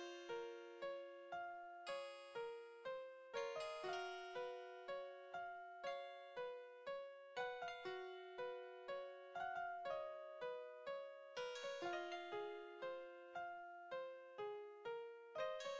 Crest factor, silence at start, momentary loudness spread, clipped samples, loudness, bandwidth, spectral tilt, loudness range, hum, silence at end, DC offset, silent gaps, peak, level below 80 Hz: 16 dB; 0 s; 6 LU; under 0.1%; -51 LUFS; 8 kHz; -3 dB/octave; 2 LU; none; 0 s; under 0.1%; none; -34 dBFS; under -90 dBFS